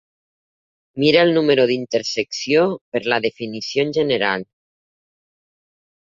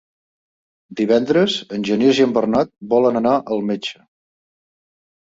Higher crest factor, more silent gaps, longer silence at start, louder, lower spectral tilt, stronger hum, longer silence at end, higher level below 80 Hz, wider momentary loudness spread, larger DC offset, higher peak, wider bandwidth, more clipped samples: about the same, 18 dB vs 16 dB; first, 2.81-2.92 s vs none; about the same, 0.95 s vs 0.9 s; about the same, -19 LUFS vs -18 LUFS; about the same, -4.5 dB/octave vs -5.5 dB/octave; neither; first, 1.6 s vs 1.35 s; about the same, -62 dBFS vs -60 dBFS; about the same, 10 LU vs 9 LU; neither; about the same, -2 dBFS vs -2 dBFS; about the same, 7.6 kHz vs 7.8 kHz; neither